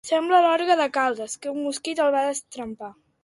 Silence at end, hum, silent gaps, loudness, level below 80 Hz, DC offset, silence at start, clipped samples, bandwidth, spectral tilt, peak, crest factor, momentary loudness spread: 0.3 s; none; none; -22 LUFS; -68 dBFS; under 0.1%; 0.05 s; under 0.1%; 11.5 kHz; -2 dB/octave; -6 dBFS; 16 dB; 17 LU